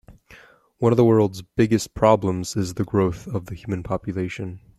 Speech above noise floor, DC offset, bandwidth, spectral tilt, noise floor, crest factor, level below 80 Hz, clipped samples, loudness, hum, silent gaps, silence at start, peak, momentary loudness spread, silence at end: 29 dB; under 0.1%; 13.5 kHz; -7 dB/octave; -50 dBFS; 20 dB; -48 dBFS; under 0.1%; -22 LUFS; none; none; 0.1 s; -2 dBFS; 13 LU; 0.2 s